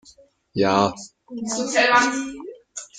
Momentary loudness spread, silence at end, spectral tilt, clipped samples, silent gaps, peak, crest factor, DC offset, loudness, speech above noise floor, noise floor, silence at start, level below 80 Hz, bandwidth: 20 LU; 0 s; -3 dB/octave; under 0.1%; none; -4 dBFS; 20 dB; under 0.1%; -20 LUFS; 33 dB; -53 dBFS; 0.55 s; -62 dBFS; 9.6 kHz